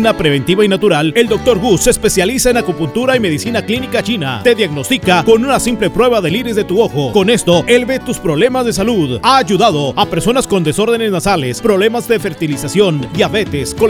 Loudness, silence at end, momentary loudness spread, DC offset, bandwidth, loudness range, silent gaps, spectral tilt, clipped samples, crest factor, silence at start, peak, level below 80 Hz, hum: -12 LUFS; 0 s; 5 LU; under 0.1%; 17.5 kHz; 2 LU; none; -4.5 dB/octave; 0.1%; 12 dB; 0 s; 0 dBFS; -34 dBFS; none